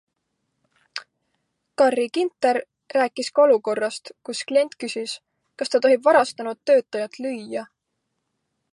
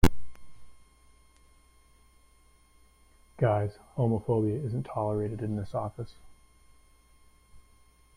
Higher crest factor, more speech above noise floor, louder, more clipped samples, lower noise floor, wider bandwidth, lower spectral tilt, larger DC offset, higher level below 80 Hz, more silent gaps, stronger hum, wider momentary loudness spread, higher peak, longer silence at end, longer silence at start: about the same, 20 dB vs 22 dB; first, 56 dB vs 31 dB; first, -22 LUFS vs -31 LUFS; neither; first, -77 dBFS vs -61 dBFS; second, 11.5 kHz vs 16 kHz; second, -3 dB/octave vs -7.5 dB/octave; neither; second, -80 dBFS vs -44 dBFS; neither; neither; first, 17 LU vs 8 LU; first, -4 dBFS vs -8 dBFS; first, 1.1 s vs 0.55 s; first, 0.95 s vs 0.05 s